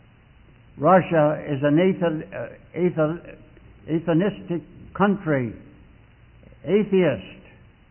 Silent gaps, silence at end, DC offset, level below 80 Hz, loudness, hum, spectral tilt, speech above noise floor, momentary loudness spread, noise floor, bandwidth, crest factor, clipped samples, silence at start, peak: none; 0.55 s; under 0.1%; -54 dBFS; -22 LUFS; none; -12 dB/octave; 30 dB; 17 LU; -52 dBFS; 3.2 kHz; 18 dB; under 0.1%; 0.75 s; -6 dBFS